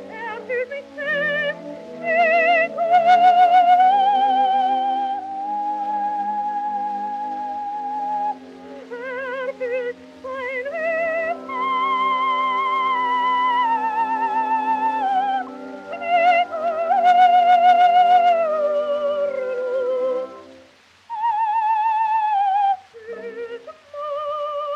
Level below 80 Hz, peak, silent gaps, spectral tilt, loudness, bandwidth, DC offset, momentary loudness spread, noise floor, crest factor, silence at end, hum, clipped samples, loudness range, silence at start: -72 dBFS; -6 dBFS; none; -4 dB/octave; -19 LUFS; 7.4 kHz; under 0.1%; 17 LU; -51 dBFS; 14 dB; 0 s; none; under 0.1%; 10 LU; 0 s